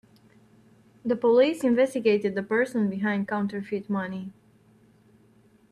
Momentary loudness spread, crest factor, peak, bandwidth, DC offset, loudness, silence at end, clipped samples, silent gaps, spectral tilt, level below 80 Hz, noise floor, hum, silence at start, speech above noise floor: 13 LU; 18 dB; -10 dBFS; 13 kHz; under 0.1%; -25 LUFS; 1.4 s; under 0.1%; none; -6.5 dB/octave; -70 dBFS; -59 dBFS; none; 1.05 s; 35 dB